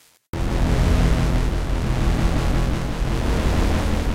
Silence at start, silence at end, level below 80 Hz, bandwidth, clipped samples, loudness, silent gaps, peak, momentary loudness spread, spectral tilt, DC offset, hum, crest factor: 0.35 s; 0 s; -22 dBFS; 15 kHz; under 0.1%; -22 LUFS; none; -6 dBFS; 6 LU; -6.5 dB/octave; 0.5%; none; 12 dB